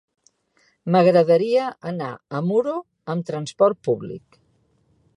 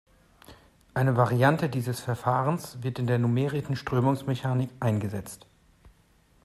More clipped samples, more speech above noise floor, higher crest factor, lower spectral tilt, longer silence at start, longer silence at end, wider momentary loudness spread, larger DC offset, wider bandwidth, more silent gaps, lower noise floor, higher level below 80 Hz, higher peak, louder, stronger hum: neither; first, 43 dB vs 36 dB; about the same, 18 dB vs 20 dB; about the same, -7.5 dB/octave vs -7 dB/octave; first, 0.85 s vs 0.5 s; first, 1 s vs 0.55 s; first, 15 LU vs 11 LU; neither; second, 11 kHz vs 14 kHz; neither; about the same, -64 dBFS vs -62 dBFS; second, -68 dBFS vs -60 dBFS; first, -4 dBFS vs -8 dBFS; first, -21 LUFS vs -27 LUFS; neither